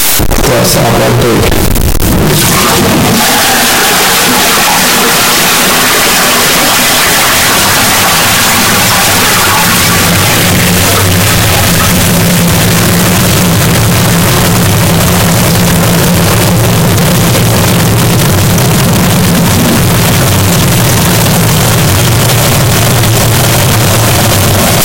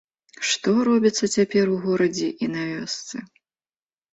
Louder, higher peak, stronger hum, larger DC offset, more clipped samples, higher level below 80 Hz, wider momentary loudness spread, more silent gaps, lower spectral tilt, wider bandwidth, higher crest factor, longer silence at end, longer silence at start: first, -6 LUFS vs -22 LUFS; first, 0 dBFS vs -6 dBFS; neither; first, 3% vs under 0.1%; neither; first, -22 dBFS vs -64 dBFS; second, 2 LU vs 10 LU; neither; about the same, -3.5 dB/octave vs -4 dB/octave; first, 17.5 kHz vs 8.2 kHz; second, 6 dB vs 16 dB; second, 0 s vs 0.85 s; second, 0 s vs 0.4 s